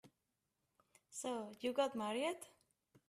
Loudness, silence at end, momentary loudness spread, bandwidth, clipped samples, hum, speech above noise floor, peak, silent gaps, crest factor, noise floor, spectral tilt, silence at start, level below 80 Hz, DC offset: -42 LUFS; 0.6 s; 13 LU; 15 kHz; under 0.1%; none; 47 dB; -24 dBFS; none; 20 dB; -88 dBFS; -3 dB/octave; 0.05 s; -88 dBFS; under 0.1%